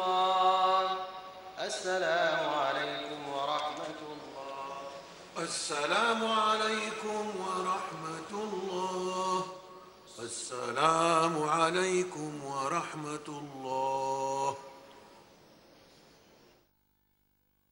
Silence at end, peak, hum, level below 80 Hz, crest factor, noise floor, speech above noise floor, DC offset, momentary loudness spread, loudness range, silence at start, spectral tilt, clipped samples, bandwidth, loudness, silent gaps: 2.5 s; -10 dBFS; none; -74 dBFS; 24 dB; -74 dBFS; 43 dB; under 0.1%; 16 LU; 7 LU; 0 s; -3 dB/octave; under 0.1%; 16 kHz; -32 LUFS; none